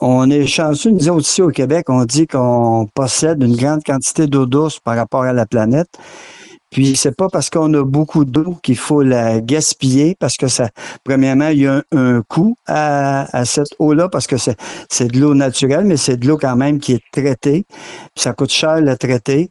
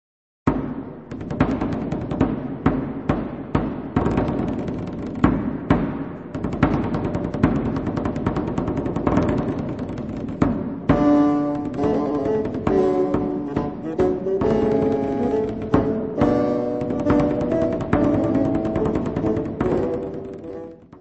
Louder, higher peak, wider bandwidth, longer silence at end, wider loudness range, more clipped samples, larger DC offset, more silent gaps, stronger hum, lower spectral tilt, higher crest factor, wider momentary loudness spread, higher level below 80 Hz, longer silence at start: first, -14 LUFS vs -22 LUFS; about the same, -2 dBFS vs 0 dBFS; first, 12 kHz vs 8 kHz; about the same, 0.05 s vs 0 s; about the same, 2 LU vs 3 LU; neither; second, under 0.1% vs 0.2%; neither; neither; second, -5 dB/octave vs -9 dB/octave; second, 12 dB vs 22 dB; second, 5 LU vs 9 LU; second, -48 dBFS vs -38 dBFS; second, 0 s vs 0.45 s